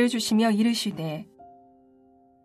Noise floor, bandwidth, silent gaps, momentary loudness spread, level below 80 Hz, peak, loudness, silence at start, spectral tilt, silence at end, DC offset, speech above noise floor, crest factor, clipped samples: -58 dBFS; 15 kHz; none; 12 LU; -70 dBFS; -12 dBFS; -24 LUFS; 0 s; -4.5 dB/octave; 0.95 s; under 0.1%; 34 dB; 16 dB; under 0.1%